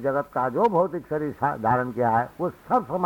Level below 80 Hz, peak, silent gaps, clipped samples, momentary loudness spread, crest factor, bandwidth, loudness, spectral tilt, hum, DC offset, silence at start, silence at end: -56 dBFS; -10 dBFS; none; under 0.1%; 7 LU; 14 dB; 19.5 kHz; -24 LUFS; -8.5 dB/octave; none; under 0.1%; 0 s; 0 s